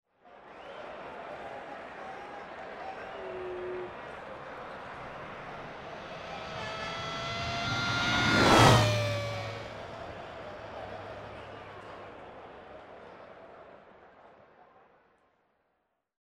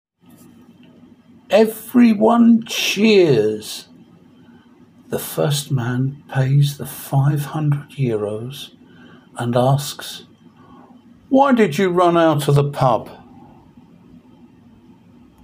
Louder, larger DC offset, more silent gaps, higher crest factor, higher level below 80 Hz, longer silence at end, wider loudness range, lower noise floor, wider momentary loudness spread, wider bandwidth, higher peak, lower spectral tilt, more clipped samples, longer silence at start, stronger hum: second, -31 LUFS vs -17 LUFS; neither; neither; first, 24 dB vs 18 dB; about the same, -54 dBFS vs -58 dBFS; second, 1.6 s vs 2.25 s; first, 21 LU vs 7 LU; first, -79 dBFS vs -48 dBFS; first, 23 LU vs 17 LU; about the same, 16 kHz vs 16 kHz; second, -10 dBFS vs 0 dBFS; second, -4.5 dB/octave vs -6 dB/octave; neither; second, 0.25 s vs 1.5 s; neither